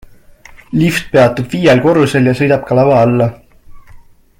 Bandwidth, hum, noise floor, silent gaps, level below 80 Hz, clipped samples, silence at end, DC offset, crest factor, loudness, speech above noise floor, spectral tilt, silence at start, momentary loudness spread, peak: 17 kHz; none; -39 dBFS; none; -42 dBFS; under 0.1%; 0.4 s; under 0.1%; 12 dB; -11 LUFS; 28 dB; -7 dB/octave; 0.7 s; 5 LU; 0 dBFS